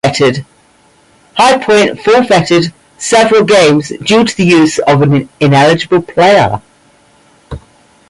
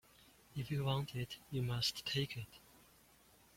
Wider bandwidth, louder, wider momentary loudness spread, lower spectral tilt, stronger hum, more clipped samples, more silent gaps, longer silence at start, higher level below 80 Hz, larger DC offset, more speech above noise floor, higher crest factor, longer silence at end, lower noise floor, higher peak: second, 11.5 kHz vs 16.5 kHz; first, -9 LUFS vs -40 LUFS; about the same, 14 LU vs 13 LU; about the same, -5 dB/octave vs -5 dB/octave; neither; neither; neither; second, 0.05 s vs 0.55 s; first, -42 dBFS vs -66 dBFS; neither; first, 39 dB vs 27 dB; second, 10 dB vs 20 dB; second, 0.5 s vs 0.8 s; second, -47 dBFS vs -67 dBFS; first, 0 dBFS vs -24 dBFS